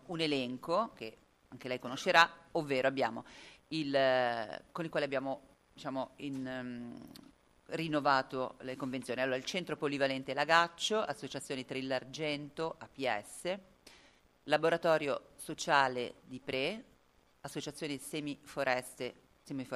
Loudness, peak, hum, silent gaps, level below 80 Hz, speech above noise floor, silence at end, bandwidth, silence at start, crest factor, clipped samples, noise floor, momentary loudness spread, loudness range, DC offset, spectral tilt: -35 LUFS; -10 dBFS; none; none; -72 dBFS; 34 dB; 0 s; 15 kHz; 0.05 s; 26 dB; under 0.1%; -69 dBFS; 16 LU; 7 LU; under 0.1%; -4 dB/octave